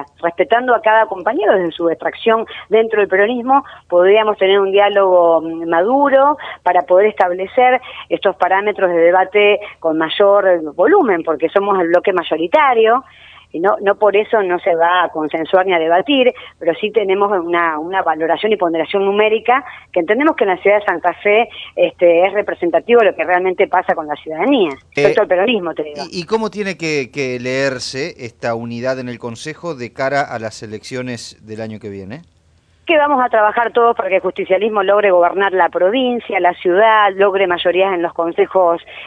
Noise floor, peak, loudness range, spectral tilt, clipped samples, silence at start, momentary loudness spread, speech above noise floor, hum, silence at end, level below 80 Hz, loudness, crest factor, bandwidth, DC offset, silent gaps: -53 dBFS; 0 dBFS; 8 LU; -5 dB/octave; under 0.1%; 0 s; 11 LU; 39 dB; none; 0 s; -58 dBFS; -14 LUFS; 14 dB; 10 kHz; under 0.1%; none